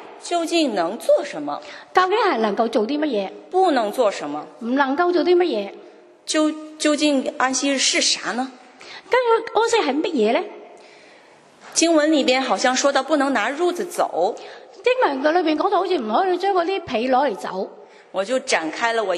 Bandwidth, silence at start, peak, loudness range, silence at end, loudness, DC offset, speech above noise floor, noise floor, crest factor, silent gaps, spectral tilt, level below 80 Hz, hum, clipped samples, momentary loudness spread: 13 kHz; 0 s; -2 dBFS; 2 LU; 0 s; -20 LUFS; under 0.1%; 29 dB; -49 dBFS; 20 dB; none; -2.5 dB/octave; -72 dBFS; none; under 0.1%; 11 LU